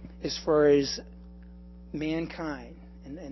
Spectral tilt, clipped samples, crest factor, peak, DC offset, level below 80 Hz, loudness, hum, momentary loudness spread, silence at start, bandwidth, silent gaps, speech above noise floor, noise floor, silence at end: -5 dB/octave; under 0.1%; 18 dB; -12 dBFS; under 0.1%; -48 dBFS; -28 LUFS; 60 Hz at -45 dBFS; 27 LU; 0 s; 6.2 kHz; none; 20 dB; -47 dBFS; 0 s